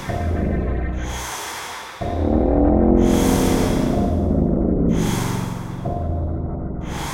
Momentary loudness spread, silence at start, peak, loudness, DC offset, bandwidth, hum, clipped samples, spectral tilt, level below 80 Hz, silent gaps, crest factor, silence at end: 12 LU; 0 s; -4 dBFS; -21 LUFS; under 0.1%; 16.5 kHz; none; under 0.1%; -6.5 dB/octave; -26 dBFS; none; 16 dB; 0 s